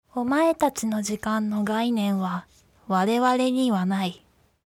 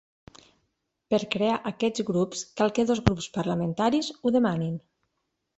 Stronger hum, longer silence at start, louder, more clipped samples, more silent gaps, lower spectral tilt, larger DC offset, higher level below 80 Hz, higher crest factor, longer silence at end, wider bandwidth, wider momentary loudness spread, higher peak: neither; second, 0.15 s vs 1.1 s; about the same, -24 LUFS vs -26 LUFS; neither; neither; about the same, -5.5 dB/octave vs -5.5 dB/octave; neither; second, -62 dBFS vs -50 dBFS; second, 16 dB vs 26 dB; second, 0.55 s vs 0.8 s; first, 17.5 kHz vs 8.2 kHz; about the same, 6 LU vs 6 LU; second, -8 dBFS vs -2 dBFS